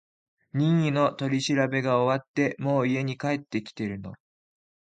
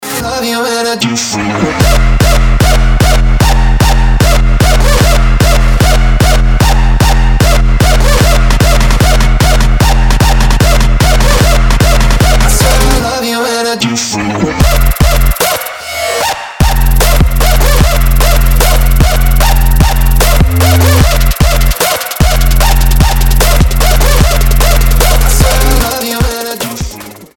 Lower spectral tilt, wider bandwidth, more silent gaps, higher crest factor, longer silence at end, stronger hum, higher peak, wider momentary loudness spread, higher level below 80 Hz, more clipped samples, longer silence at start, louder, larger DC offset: first, -6.5 dB/octave vs -4.5 dB/octave; second, 9.2 kHz vs 18 kHz; first, 2.28-2.34 s vs none; first, 18 dB vs 6 dB; first, 0.75 s vs 0.1 s; neither; second, -10 dBFS vs 0 dBFS; first, 10 LU vs 4 LU; second, -66 dBFS vs -8 dBFS; second, under 0.1% vs 0.3%; first, 0.55 s vs 0 s; second, -26 LUFS vs -9 LUFS; neither